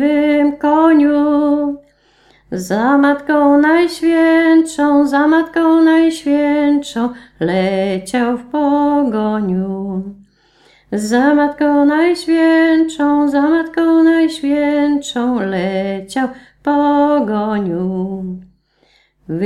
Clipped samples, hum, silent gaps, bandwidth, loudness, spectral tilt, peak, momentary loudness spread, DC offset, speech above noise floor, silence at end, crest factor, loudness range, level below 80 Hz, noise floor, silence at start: under 0.1%; none; none; 12 kHz; -14 LUFS; -6 dB/octave; 0 dBFS; 11 LU; under 0.1%; 42 dB; 0 s; 14 dB; 5 LU; -50 dBFS; -55 dBFS; 0 s